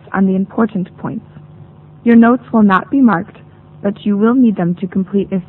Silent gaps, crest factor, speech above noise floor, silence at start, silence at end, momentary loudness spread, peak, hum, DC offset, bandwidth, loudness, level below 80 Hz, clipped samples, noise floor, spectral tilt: none; 14 dB; 26 dB; 0.1 s; 0.05 s; 14 LU; 0 dBFS; none; under 0.1%; 4.1 kHz; -13 LUFS; -52 dBFS; under 0.1%; -38 dBFS; -11 dB/octave